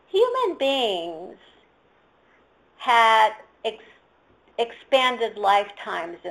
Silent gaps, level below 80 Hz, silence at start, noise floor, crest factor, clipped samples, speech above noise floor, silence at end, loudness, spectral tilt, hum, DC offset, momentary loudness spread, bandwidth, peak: none; -70 dBFS; 0.15 s; -60 dBFS; 18 dB; under 0.1%; 38 dB; 0 s; -22 LUFS; -2 dB/octave; none; under 0.1%; 15 LU; 13.5 kHz; -6 dBFS